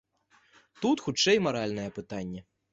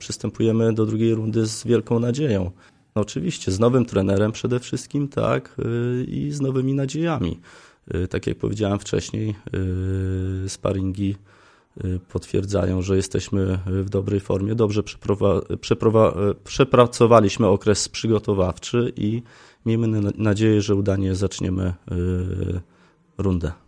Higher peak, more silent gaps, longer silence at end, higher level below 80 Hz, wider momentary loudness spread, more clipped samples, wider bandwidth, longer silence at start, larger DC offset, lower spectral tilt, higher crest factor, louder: second, -12 dBFS vs 0 dBFS; neither; first, 0.3 s vs 0.15 s; second, -62 dBFS vs -46 dBFS; first, 14 LU vs 9 LU; neither; second, 8 kHz vs 10.5 kHz; first, 0.8 s vs 0 s; neither; second, -4 dB/octave vs -6.5 dB/octave; about the same, 20 dB vs 22 dB; second, -28 LUFS vs -22 LUFS